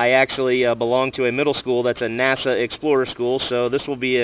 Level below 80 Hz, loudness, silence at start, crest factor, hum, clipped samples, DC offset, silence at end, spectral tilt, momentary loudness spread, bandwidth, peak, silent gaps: -54 dBFS; -20 LUFS; 0 s; 16 dB; none; under 0.1%; under 0.1%; 0 s; -9 dB/octave; 4 LU; 4 kHz; -4 dBFS; none